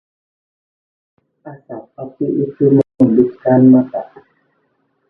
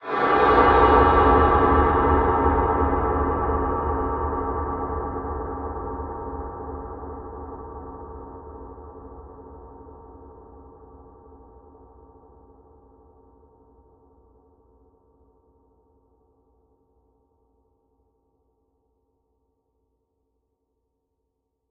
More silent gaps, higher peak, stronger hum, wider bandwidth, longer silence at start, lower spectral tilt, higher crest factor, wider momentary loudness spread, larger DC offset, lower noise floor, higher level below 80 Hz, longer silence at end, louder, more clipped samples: neither; first, 0 dBFS vs -4 dBFS; neither; second, 2.1 kHz vs 5.2 kHz; first, 1.45 s vs 0 s; first, -12.5 dB/octave vs -9.5 dB/octave; second, 16 dB vs 22 dB; second, 23 LU vs 26 LU; neither; second, -64 dBFS vs -77 dBFS; second, -56 dBFS vs -34 dBFS; second, 1.05 s vs 10.85 s; first, -13 LUFS vs -21 LUFS; neither